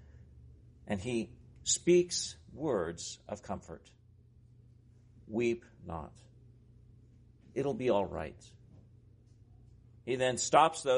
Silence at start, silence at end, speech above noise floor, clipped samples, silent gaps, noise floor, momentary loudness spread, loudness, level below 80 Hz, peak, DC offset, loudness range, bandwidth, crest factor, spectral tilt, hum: 0.15 s; 0 s; 28 dB; under 0.1%; none; -61 dBFS; 18 LU; -33 LUFS; -62 dBFS; -10 dBFS; under 0.1%; 8 LU; 10.5 kHz; 24 dB; -4 dB/octave; none